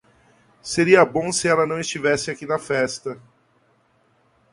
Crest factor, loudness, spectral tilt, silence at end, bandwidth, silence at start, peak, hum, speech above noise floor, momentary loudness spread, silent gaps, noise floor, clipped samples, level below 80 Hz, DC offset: 22 dB; -20 LUFS; -4 dB/octave; 1.35 s; 11.5 kHz; 0.65 s; 0 dBFS; none; 42 dB; 17 LU; none; -62 dBFS; under 0.1%; -58 dBFS; under 0.1%